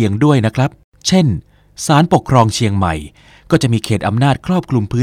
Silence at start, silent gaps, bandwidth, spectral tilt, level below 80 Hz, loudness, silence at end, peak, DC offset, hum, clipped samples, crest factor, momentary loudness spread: 0 s; 0.84-0.92 s; 15 kHz; -6 dB/octave; -38 dBFS; -15 LUFS; 0 s; 0 dBFS; under 0.1%; none; under 0.1%; 14 dB; 8 LU